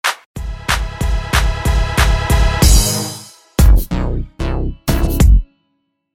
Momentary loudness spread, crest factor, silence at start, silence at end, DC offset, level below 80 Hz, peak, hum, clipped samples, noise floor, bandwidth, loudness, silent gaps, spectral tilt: 11 LU; 14 dB; 0.05 s; 0.7 s; under 0.1%; -16 dBFS; 0 dBFS; none; under 0.1%; -67 dBFS; 17 kHz; -16 LUFS; 0.26-0.34 s; -4.5 dB/octave